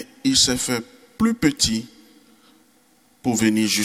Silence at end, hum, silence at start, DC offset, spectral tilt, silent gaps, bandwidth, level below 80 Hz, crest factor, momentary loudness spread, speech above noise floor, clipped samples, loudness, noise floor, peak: 0 s; none; 0 s; under 0.1%; -3 dB/octave; none; 16 kHz; -46 dBFS; 18 dB; 10 LU; 38 dB; under 0.1%; -20 LUFS; -58 dBFS; -4 dBFS